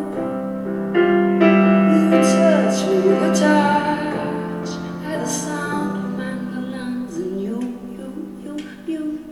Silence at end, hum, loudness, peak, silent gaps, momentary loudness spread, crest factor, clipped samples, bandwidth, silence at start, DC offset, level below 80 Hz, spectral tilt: 0 s; none; -19 LUFS; 0 dBFS; none; 15 LU; 18 dB; under 0.1%; 13 kHz; 0 s; under 0.1%; -54 dBFS; -6 dB/octave